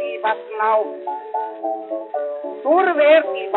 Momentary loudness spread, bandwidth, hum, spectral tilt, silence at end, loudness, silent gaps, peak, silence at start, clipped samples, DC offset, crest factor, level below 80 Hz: 13 LU; 4.1 kHz; none; 0.5 dB/octave; 0 s; -19 LUFS; none; -2 dBFS; 0 s; under 0.1%; under 0.1%; 18 dB; under -90 dBFS